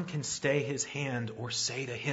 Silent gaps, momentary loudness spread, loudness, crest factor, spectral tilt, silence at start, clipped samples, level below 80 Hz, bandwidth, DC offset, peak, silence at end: none; 5 LU; -33 LUFS; 18 dB; -3.5 dB/octave; 0 s; under 0.1%; -68 dBFS; 8 kHz; under 0.1%; -16 dBFS; 0 s